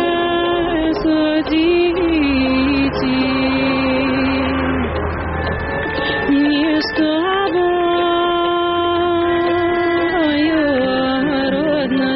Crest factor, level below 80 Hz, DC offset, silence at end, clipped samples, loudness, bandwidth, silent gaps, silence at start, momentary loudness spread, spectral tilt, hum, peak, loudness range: 10 dB; -34 dBFS; under 0.1%; 0 s; under 0.1%; -16 LUFS; 5.8 kHz; none; 0 s; 3 LU; -3.5 dB/octave; none; -6 dBFS; 2 LU